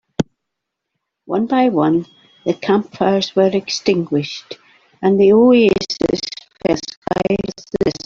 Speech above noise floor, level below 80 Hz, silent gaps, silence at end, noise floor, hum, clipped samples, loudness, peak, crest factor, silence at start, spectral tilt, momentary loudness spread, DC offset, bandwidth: 64 dB; -50 dBFS; 6.97-7.02 s; 0.1 s; -79 dBFS; none; under 0.1%; -17 LUFS; -2 dBFS; 16 dB; 0.2 s; -5.5 dB/octave; 13 LU; under 0.1%; 7.4 kHz